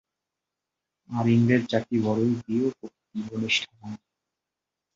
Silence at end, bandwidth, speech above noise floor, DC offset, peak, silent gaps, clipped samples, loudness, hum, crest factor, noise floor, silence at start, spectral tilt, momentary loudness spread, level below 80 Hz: 1 s; 7.6 kHz; 62 dB; under 0.1%; -8 dBFS; none; under 0.1%; -25 LUFS; none; 20 dB; -87 dBFS; 1.1 s; -6 dB/octave; 19 LU; -62 dBFS